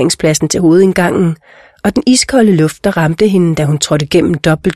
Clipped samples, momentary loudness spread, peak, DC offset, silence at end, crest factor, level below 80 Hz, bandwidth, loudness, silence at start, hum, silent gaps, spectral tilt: under 0.1%; 6 LU; 0 dBFS; 0.3%; 0 s; 10 dB; -38 dBFS; 14 kHz; -11 LUFS; 0 s; none; none; -5 dB/octave